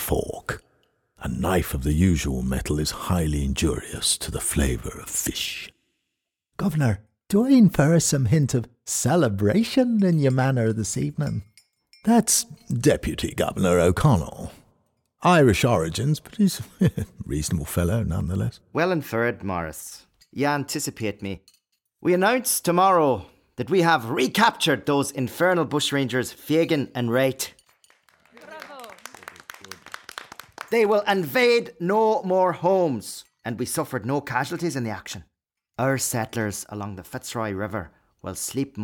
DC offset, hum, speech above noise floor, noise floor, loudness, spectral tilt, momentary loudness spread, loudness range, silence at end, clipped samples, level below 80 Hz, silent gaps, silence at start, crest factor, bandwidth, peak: under 0.1%; none; 59 dB; -82 dBFS; -23 LUFS; -5 dB/octave; 18 LU; 7 LU; 0 s; under 0.1%; -40 dBFS; none; 0 s; 18 dB; 18.5 kHz; -6 dBFS